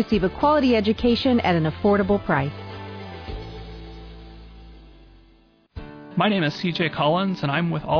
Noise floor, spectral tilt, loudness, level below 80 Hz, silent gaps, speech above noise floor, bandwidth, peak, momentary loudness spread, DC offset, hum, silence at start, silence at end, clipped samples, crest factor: -56 dBFS; -7.5 dB/octave; -21 LUFS; -42 dBFS; none; 36 dB; 5.4 kHz; -8 dBFS; 21 LU; under 0.1%; none; 0 s; 0 s; under 0.1%; 16 dB